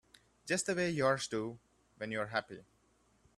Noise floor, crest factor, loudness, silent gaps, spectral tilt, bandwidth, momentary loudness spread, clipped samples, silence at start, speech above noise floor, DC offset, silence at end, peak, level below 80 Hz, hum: -71 dBFS; 22 dB; -36 LUFS; none; -4 dB/octave; 13.5 kHz; 21 LU; under 0.1%; 0.45 s; 36 dB; under 0.1%; 0.75 s; -16 dBFS; -72 dBFS; none